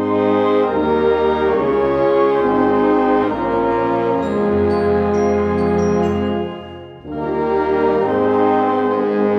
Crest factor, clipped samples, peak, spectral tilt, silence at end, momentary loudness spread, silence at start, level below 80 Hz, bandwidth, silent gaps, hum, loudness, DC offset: 12 dB; under 0.1%; -4 dBFS; -8 dB/octave; 0 s; 6 LU; 0 s; -42 dBFS; 6.2 kHz; none; none; -16 LUFS; under 0.1%